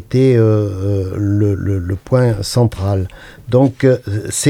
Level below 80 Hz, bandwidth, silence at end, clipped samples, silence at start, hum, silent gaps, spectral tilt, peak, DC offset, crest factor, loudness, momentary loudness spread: -42 dBFS; 15 kHz; 0 s; under 0.1%; 0 s; none; none; -6.5 dB/octave; 0 dBFS; under 0.1%; 14 dB; -15 LUFS; 8 LU